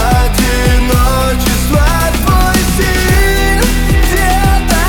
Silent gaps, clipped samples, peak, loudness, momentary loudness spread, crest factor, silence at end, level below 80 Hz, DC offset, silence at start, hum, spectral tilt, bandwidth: none; under 0.1%; 0 dBFS; -11 LUFS; 2 LU; 10 dB; 0 s; -12 dBFS; under 0.1%; 0 s; none; -4.5 dB/octave; 19.5 kHz